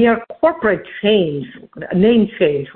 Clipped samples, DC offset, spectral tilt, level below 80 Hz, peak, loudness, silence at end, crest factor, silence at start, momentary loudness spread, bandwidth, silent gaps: under 0.1%; under 0.1%; -11.5 dB/octave; -48 dBFS; -2 dBFS; -16 LUFS; 0.05 s; 14 dB; 0 s; 12 LU; 4.3 kHz; none